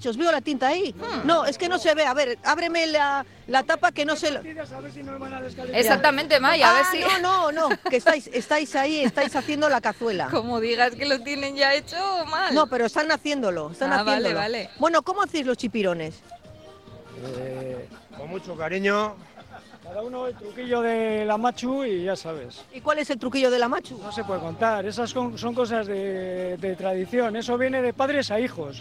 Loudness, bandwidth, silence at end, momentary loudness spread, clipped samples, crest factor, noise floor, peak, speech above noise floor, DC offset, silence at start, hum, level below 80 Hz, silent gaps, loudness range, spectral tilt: -23 LUFS; 16.5 kHz; 0 s; 14 LU; under 0.1%; 22 dB; -47 dBFS; -2 dBFS; 23 dB; under 0.1%; 0 s; none; -60 dBFS; none; 9 LU; -3.5 dB/octave